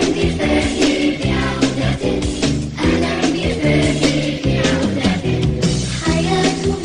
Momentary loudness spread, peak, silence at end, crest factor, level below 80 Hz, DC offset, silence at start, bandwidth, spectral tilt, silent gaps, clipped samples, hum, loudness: 3 LU; -2 dBFS; 0 s; 14 dB; -30 dBFS; under 0.1%; 0 s; 10.5 kHz; -5 dB/octave; none; under 0.1%; none; -17 LUFS